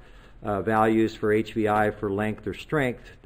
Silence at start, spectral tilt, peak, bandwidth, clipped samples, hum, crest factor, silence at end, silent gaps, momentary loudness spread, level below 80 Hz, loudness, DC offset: 0.1 s; -7 dB/octave; -8 dBFS; 15.5 kHz; under 0.1%; none; 18 dB; 0.1 s; none; 8 LU; -50 dBFS; -25 LUFS; under 0.1%